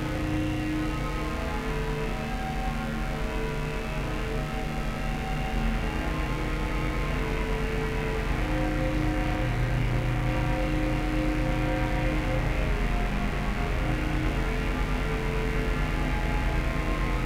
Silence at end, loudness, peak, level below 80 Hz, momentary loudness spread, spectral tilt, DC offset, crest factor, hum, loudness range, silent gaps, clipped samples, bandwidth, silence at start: 0 s; -29 LUFS; -14 dBFS; -30 dBFS; 4 LU; -6.5 dB/octave; under 0.1%; 14 dB; none; 3 LU; none; under 0.1%; 15 kHz; 0 s